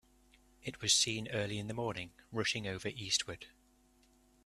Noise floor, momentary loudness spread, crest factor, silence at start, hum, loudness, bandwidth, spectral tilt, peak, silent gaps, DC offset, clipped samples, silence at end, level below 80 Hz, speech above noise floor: -68 dBFS; 18 LU; 22 dB; 0.65 s; none; -35 LUFS; 14 kHz; -2 dB/octave; -16 dBFS; none; under 0.1%; under 0.1%; 1 s; -66 dBFS; 32 dB